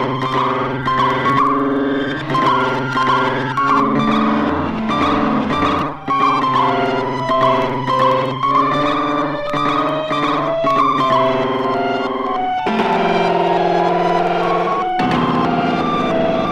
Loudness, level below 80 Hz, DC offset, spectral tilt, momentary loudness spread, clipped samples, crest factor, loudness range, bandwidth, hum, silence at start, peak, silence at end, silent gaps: -16 LUFS; -44 dBFS; under 0.1%; -6.5 dB/octave; 4 LU; under 0.1%; 14 dB; 1 LU; 11.5 kHz; none; 0 s; -2 dBFS; 0 s; none